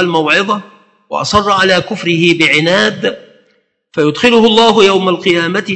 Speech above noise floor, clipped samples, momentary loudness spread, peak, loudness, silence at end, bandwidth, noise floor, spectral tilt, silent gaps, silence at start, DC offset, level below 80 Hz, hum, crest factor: 46 dB; 0.2%; 11 LU; 0 dBFS; -10 LUFS; 0 s; 9.2 kHz; -57 dBFS; -4.5 dB/octave; none; 0 s; under 0.1%; -46 dBFS; none; 12 dB